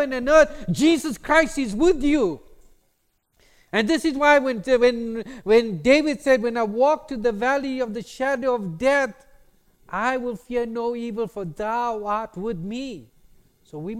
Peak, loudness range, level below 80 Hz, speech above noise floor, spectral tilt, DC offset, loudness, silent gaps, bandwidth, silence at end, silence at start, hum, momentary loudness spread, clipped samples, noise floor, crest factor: -2 dBFS; 7 LU; -44 dBFS; 47 dB; -5 dB/octave; under 0.1%; -22 LUFS; none; 15.5 kHz; 0 s; 0 s; none; 12 LU; under 0.1%; -68 dBFS; 20 dB